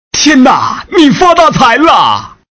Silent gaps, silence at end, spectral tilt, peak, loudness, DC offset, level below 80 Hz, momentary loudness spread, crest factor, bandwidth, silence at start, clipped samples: none; 0.2 s; -3.5 dB/octave; 0 dBFS; -6 LUFS; under 0.1%; -38 dBFS; 6 LU; 6 dB; 8 kHz; 0.15 s; 7%